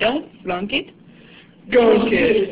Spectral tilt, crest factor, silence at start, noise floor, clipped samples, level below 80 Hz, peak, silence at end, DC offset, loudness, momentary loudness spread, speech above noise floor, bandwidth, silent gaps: -9 dB/octave; 16 dB; 0 s; -46 dBFS; under 0.1%; -48 dBFS; -4 dBFS; 0 s; under 0.1%; -18 LUFS; 12 LU; 28 dB; 4 kHz; none